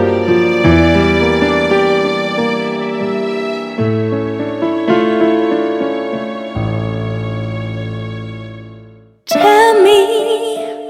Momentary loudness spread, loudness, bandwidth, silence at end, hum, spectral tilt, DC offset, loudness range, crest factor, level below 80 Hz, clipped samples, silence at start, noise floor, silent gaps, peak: 13 LU; -14 LUFS; 16.5 kHz; 0 s; none; -6 dB/octave; under 0.1%; 7 LU; 14 dB; -36 dBFS; under 0.1%; 0 s; -40 dBFS; none; 0 dBFS